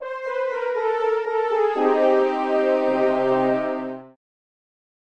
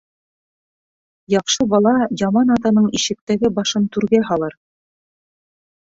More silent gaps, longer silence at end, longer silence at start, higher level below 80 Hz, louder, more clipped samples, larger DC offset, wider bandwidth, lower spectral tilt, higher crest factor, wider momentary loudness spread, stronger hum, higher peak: second, none vs 3.21-3.27 s; second, 0.95 s vs 1.35 s; second, 0 s vs 1.3 s; second, -72 dBFS vs -54 dBFS; second, -21 LUFS vs -17 LUFS; neither; first, 0.2% vs under 0.1%; about the same, 8.2 kHz vs 8 kHz; first, -6.5 dB/octave vs -4.5 dB/octave; about the same, 16 dB vs 16 dB; about the same, 8 LU vs 6 LU; neither; second, -6 dBFS vs -2 dBFS